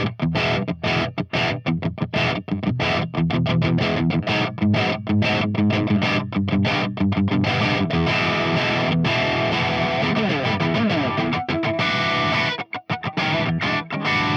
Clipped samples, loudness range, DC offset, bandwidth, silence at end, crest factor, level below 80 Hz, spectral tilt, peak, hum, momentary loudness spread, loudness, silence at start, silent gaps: under 0.1%; 2 LU; under 0.1%; 7.8 kHz; 0 s; 12 dB; -50 dBFS; -6.5 dB/octave; -8 dBFS; none; 4 LU; -21 LUFS; 0 s; none